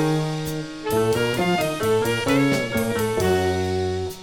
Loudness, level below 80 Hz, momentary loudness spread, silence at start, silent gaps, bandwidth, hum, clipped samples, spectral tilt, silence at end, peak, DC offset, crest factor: -22 LUFS; -46 dBFS; 6 LU; 0 s; none; 19 kHz; none; under 0.1%; -5.5 dB/octave; 0 s; -6 dBFS; under 0.1%; 16 dB